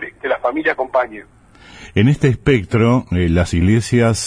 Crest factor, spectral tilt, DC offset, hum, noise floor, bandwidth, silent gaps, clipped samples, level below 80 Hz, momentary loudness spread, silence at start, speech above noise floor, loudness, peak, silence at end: 14 dB; -6.5 dB/octave; under 0.1%; none; -41 dBFS; 10.5 kHz; none; under 0.1%; -34 dBFS; 7 LU; 0 s; 26 dB; -16 LUFS; -2 dBFS; 0 s